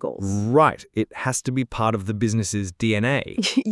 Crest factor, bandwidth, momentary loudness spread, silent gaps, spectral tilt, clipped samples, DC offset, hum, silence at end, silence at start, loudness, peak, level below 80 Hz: 20 dB; 12 kHz; 8 LU; none; -5 dB/octave; under 0.1%; under 0.1%; none; 0 s; 0 s; -22 LUFS; -4 dBFS; -50 dBFS